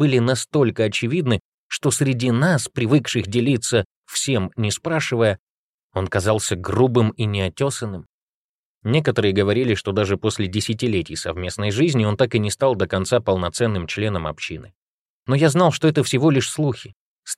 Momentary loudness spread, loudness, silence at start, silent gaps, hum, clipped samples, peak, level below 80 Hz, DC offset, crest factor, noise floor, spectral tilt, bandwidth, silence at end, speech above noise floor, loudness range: 9 LU; -20 LUFS; 0 s; 1.40-1.70 s, 3.85-4.04 s, 5.39-5.90 s, 8.06-8.81 s, 14.75-15.26 s, 16.95-17.23 s; none; under 0.1%; -4 dBFS; -50 dBFS; under 0.1%; 16 dB; under -90 dBFS; -5.5 dB/octave; 15.5 kHz; 0.05 s; over 70 dB; 2 LU